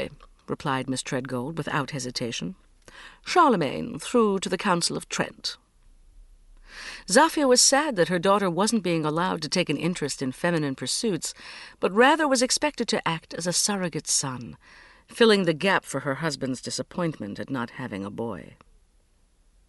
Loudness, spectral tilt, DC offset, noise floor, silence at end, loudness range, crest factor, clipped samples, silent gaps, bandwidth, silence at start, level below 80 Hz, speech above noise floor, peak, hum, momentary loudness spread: -24 LUFS; -3.5 dB/octave; under 0.1%; -62 dBFS; 1.25 s; 6 LU; 20 dB; under 0.1%; none; 11.5 kHz; 0 s; -58 dBFS; 37 dB; -6 dBFS; none; 14 LU